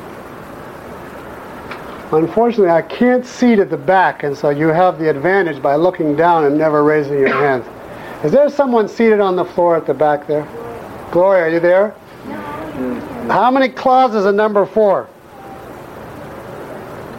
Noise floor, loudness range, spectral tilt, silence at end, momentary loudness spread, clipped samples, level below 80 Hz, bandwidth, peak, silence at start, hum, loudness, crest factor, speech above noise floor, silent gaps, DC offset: -34 dBFS; 3 LU; -7 dB/octave; 0 s; 19 LU; under 0.1%; -50 dBFS; 16 kHz; -2 dBFS; 0 s; none; -14 LUFS; 12 dB; 21 dB; none; under 0.1%